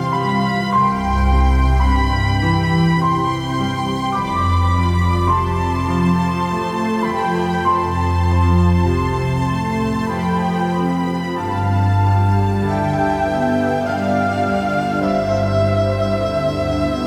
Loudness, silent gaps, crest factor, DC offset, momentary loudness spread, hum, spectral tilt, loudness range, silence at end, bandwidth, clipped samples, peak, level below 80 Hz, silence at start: -18 LUFS; none; 12 dB; under 0.1%; 5 LU; none; -7.5 dB/octave; 2 LU; 0 s; 12.5 kHz; under 0.1%; -4 dBFS; -26 dBFS; 0 s